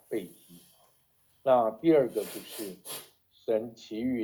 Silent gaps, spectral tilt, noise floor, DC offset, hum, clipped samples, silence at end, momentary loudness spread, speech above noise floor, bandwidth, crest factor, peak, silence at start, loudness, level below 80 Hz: none; -5.5 dB/octave; -68 dBFS; under 0.1%; none; under 0.1%; 0 s; 16 LU; 40 dB; over 20 kHz; 20 dB; -12 dBFS; 0.1 s; -30 LUFS; -72 dBFS